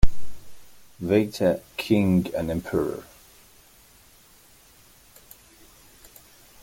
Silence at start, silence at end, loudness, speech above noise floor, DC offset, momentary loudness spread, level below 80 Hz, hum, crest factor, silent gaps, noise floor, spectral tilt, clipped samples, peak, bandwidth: 0 s; 3.6 s; -25 LUFS; 31 dB; under 0.1%; 27 LU; -36 dBFS; none; 22 dB; none; -54 dBFS; -7 dB/octave; under 0.1%; -2 dBFS; 17 kHz